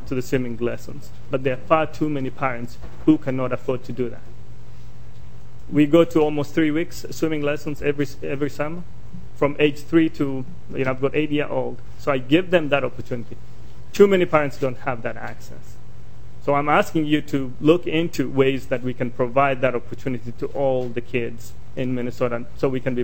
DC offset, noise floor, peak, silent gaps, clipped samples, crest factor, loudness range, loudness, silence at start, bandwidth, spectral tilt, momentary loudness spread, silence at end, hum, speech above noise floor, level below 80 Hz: 5%; -42 dBFS; 0 dBFS; none; under 0.1%; 22 dB; 4 LU; -22 LUFS; 0 s; 17 kHz; -6.5 dB/octave; 14 LU; 0 s; none; 21 dB; -46 dBFS